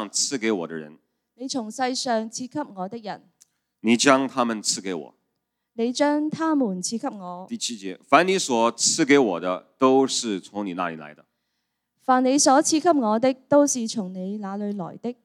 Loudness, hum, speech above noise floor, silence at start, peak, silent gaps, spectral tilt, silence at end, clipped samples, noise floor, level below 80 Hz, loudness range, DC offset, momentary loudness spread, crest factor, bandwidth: -23 LUFS; none; 56 dB; 0 s; 0 dBFS; none; -3 dB/octave; 0.1 s; under 0.1%; -78 dBFS; -80 dBFS; 6 LU; under 0.1%; 15 LU; 22 dB; 14 kHz